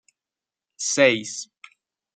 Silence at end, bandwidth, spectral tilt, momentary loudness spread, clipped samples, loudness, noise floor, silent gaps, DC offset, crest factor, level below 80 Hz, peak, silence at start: 0.7 s; 9.4 kHz; -2 dB/octave; 17 LU; under 0.1%; -21 LUFS; -90 dBFS; none; under 0.1%; 24 dB; -74 dBFS; -2 dBFS; 0.8 s